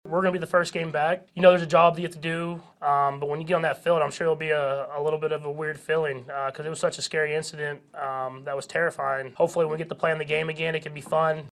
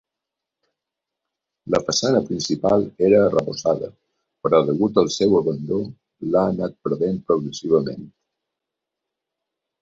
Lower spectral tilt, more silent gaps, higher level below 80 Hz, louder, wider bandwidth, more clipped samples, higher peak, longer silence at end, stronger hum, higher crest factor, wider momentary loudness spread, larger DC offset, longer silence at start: about the same, -5 dB/octave vs -5.5 dB/octave; neither; second, -68 dBFS vs -56 dBFS; second, -26 LUFS vs -20 LUFS; first, 12.5 kHz vs 7.8 kHz; neither; about the same, -4 dBFS vs -4 dBFS; second, 0 s vs 1.75 s; neither; about the same, 22 dB vs 18 dB; about the same, 11 LU vs 10 LU; neither; second, 0.05 s vs 1.65 s